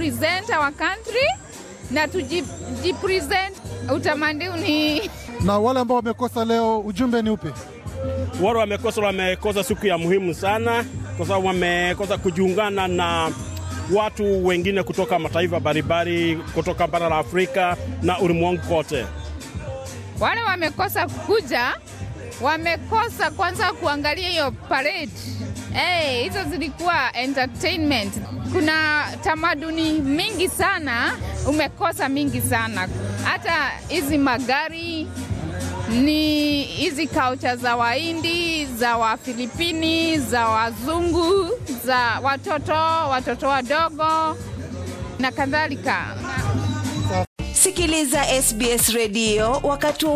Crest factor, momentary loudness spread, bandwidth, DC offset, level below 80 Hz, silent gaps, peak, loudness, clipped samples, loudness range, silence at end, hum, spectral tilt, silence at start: 18 dB; 9 LU; 15 kHz; under 0.1%; -40 dBFS; 47.27-47.36 s; -4 dBFS; -21 LUFS; under 0.1%; 2 LU; 0 s; none; -4 dB/octave; 0 s